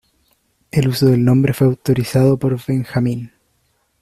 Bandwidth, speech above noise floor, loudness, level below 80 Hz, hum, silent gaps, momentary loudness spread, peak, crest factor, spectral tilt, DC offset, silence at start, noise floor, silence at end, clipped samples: 14.5 kHz; 49 dB; -16 LUFS; -48 dBFS; none; none; 8 LU; -2 dBFS; 14 dB; -7.5 dB/octave; under 0.1%; 0.75 s; -63 dBFS; 0.75 s; under 0.1%